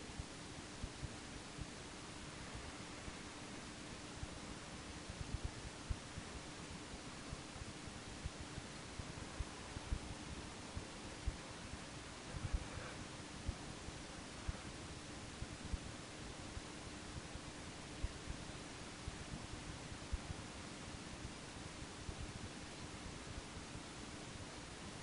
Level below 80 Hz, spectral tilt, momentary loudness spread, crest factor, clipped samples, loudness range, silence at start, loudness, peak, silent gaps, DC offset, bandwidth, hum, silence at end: -54 dBFS; -4 dB/octave; 3 LU; 22 dB; under 0.1%; 2 LU; 0 s; -50 LUFS; -26 dBFS; none; under 0.1%; 10.5 kHz; none; 0 s